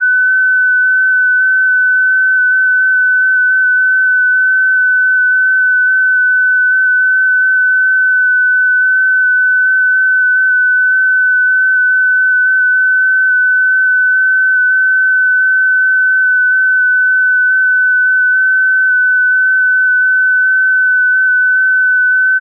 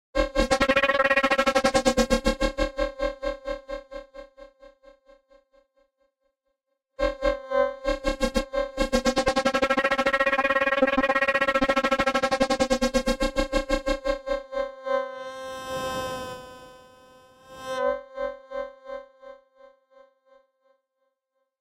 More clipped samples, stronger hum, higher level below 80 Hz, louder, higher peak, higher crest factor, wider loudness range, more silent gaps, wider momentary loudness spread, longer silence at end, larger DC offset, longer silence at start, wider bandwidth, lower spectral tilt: neither; neither; second, under -90 dBFS vs -40 dBFS; first, -9 LUFS vs -25 LUFS; about the same, -6 dBFS vs -6 dBFS; second, 4 dB vs 20 dB; second, 0 LU vs 14 LU; neither; second, 0 LU vs 15 LU; second, 0 s vs 2.25 s; neither; second, 0 s vs 0.15 s; second, 1.7 kHz vs 15.5 kHz; second, 8.5 dB/octave vs -3.5 dB/octave